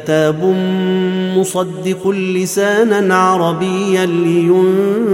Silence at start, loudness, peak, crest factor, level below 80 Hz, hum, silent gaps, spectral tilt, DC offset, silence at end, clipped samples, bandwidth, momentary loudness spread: 0 s; -14 LUFS; 0 dBFS; 14 dB; -60 dBFS; none; none; -5.5 dB/octave; under 0.1%; 0 s; under 0.1%; 16.5 kHz; 5 LU